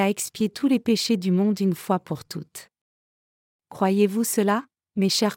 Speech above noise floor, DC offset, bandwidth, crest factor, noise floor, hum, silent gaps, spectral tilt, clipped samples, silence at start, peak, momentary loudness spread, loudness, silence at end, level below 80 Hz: over 67 dB; under 0.1%; 17 kHz; 16 dB; under -90 dBFS; none; 2.81-3.59 s; -5 dB/octave; under 0.1%; 0 s; -8 dBFS; 12 LU; -23 LUFS; 0 s; -70 dBFS